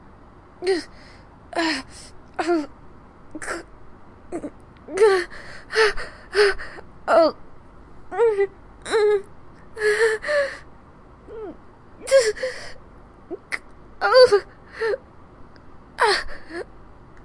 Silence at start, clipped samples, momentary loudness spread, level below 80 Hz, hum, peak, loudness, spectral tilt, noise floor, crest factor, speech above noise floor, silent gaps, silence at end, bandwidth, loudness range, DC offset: 0.6 s; under 0.1%; 21 LU; -48 dBFS; none; -2 dBFS; -21 LUFS; -3 dB/octave; -47 dBFS; 22 dB; 27 dB; none; 0.05 s; 11.5 kHz; 7 LU; under 0.1%